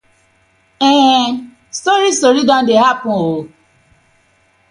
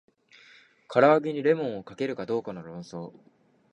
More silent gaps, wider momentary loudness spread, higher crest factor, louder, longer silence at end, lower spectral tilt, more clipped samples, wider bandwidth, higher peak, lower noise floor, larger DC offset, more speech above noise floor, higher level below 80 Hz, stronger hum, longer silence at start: neither; second, 11 LU vs 19 LU; second, 14 dB vs 22 dB; first, -12 LUFS vs -25 LUFS; first, 1.25 s vs 0.6 s; second, -3.5 dB/octave vs -7 dB/octave; neither; first, 11 kHz vs 9.2 kHz; first, 0 dBFS vs -6 dBFS; about the same, -55 dBFS vs -56 dBFS; neither; first, 43 dB vs 30 dB; first, -58 dBFS vs -72 dBFS; neither; about the same, 0.8 s vs 0.9 s